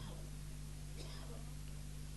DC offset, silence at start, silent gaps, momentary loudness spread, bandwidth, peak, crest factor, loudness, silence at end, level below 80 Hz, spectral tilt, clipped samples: under 0.1%; 0 s; none; 1 LU; 12 kHz; -36 dBFS; 12 dB; -50 LUFS; 0 s; -50 dBFS; -5 dB/octave; under 0.1%